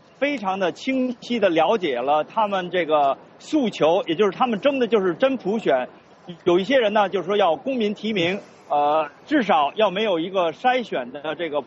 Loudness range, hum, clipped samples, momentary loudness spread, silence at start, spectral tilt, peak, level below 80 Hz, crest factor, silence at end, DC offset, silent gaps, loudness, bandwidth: 1 LU; none; under 0.1%; 6 LU; 0.2 s; -3 dB/octave; -6 dBFS; -66 dBFS; 16 dB; 0 s; under 0.1%; none; -22 LUFS; 8 kHz